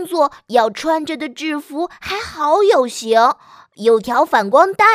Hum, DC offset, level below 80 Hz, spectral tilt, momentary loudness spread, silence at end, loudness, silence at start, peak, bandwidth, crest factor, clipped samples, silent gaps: none; under 0.1%; -56 dBFS; -3.5 dB/octave; 11 LU; 0 s; -16 LUFS; 0 s; 0 dBFS; 16 kHz; 16 dB; under 0.1%; none